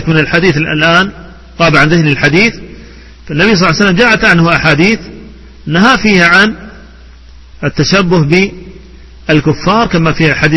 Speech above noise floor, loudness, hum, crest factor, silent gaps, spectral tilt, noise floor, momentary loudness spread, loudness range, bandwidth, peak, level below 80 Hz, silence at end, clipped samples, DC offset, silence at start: 26 dB; -8 LUFS; none; 10 dB; none; -5.5 dB/octave; -34 dBFS; 11 LU; 4 LU; 11 kHz; 0 dBFS; -32 dBFS; 0 s; 0.6%; under 0.1%; 0 s